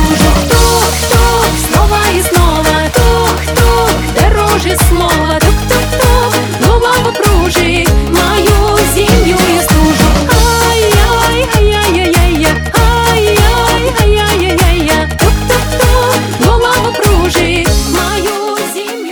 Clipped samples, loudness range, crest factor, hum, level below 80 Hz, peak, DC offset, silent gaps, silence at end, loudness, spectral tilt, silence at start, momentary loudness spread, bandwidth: 0.3%; 1 LU; 8 dB; none; -14 dBFS; 0 dBFS; under 0.1%; none; 0 s; -9 LUFS; -4.5 dB/octave; 0 s; 3 LU; over 20 kHz